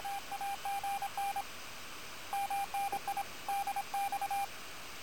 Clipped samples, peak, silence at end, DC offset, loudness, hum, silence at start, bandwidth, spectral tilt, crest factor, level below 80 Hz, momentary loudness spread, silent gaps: under 0.1%; -26 dBFS; 0 s; 0.4%; -38 LUFS; none; 0 s; 17 kHz; -1 dB/octave; 12 dB; -68 dBFS; 9 LU; none